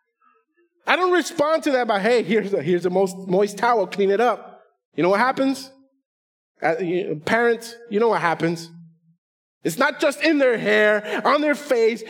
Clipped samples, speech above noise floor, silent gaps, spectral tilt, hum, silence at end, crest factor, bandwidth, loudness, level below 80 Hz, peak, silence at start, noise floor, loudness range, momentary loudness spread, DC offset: under 0.1%; 44 dB; 4.85-4.92 s, 6.05-6.55 s, 9.18-9.61 s; -5 dB/octave; none; 0 s; 20 dB; 17.5 kHz; -20 LUFS; -78 dBFS; 0 dBFS; 0.85 s; -64 dBFS; 3 LU; 9 LU; under 0.1%